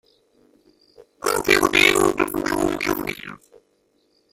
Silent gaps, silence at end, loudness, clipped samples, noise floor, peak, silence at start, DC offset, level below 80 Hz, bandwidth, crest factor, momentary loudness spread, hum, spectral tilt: none; 0.95 s; -19 LUFS; under 0.1%; -65 dBFS; -2 dBFS; 1 s; under 0.1%; -48 dBFS; 16.5 kHz; 22 dB; 15 LU; none; -3 dB/octave